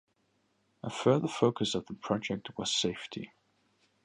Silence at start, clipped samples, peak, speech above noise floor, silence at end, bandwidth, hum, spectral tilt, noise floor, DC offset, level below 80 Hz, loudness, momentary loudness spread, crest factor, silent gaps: 0.85 s; under 0.1%; -12 dBFS; 43 dB; 0.8 s; 11.5 kHz; none; -4.5 dB/octave; -74 dBFS; under 0.1%; -68 dBFS; -31 LUFS; 15 LU; 22 dB; none